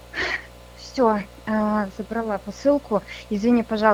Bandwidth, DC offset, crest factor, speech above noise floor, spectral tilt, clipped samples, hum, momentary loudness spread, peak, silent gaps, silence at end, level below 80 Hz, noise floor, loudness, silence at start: 14.5 kHz; under 0.1%; 20 dB; 20 dB; -6 dB/octave; under 0.1%; 60 Hz at -45 dBFS; 9 LU; -2 dBFS; none; 0 s; -48 dBFS; -42 dBFS; -24 LUFS; 0.15 s